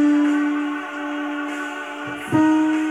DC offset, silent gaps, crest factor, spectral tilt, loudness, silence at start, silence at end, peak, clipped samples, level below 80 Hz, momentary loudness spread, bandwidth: under 0.1%; none; 14 dB; -5.5 dB/octave; -22 LUFS; 0 s; 0 s; -6 dBFS; under 0.1%; -64 dBFS; 12 LU; 11 kHz